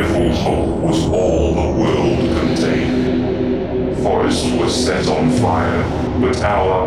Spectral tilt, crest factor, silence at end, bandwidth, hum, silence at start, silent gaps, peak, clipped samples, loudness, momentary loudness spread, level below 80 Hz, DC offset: -6 dB/octave; 12 dB; 0 s; 13 kHz; none; 0 s; none; -4 dBFS; under 0.1%; -16 LUFS; 3 LU; -28 dBFS; under 0.1%